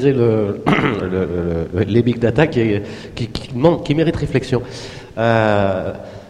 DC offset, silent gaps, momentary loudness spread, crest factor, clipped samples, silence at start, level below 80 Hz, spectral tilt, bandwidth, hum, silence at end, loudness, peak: under 0.1%; none; 11 LU; 18 dB; under 0.1%; 0 s; -40 dBFS; -7.5 dB/octave; 11 kHz; none; 0 s; -17 LUFS; 0 dBFS